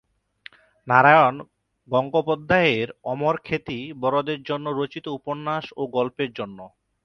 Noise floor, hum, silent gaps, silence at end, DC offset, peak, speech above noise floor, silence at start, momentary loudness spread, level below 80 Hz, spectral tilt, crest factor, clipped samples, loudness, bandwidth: -49 dBFS; none; none; 0.35 s; under 0.1%; 0 dBFS; 27 dB; 0.85 s; 14 LU; -58 dBFS; -7 dB/octave; 22 dB; under 0.1%; -22 LUFS; 6.6 kHz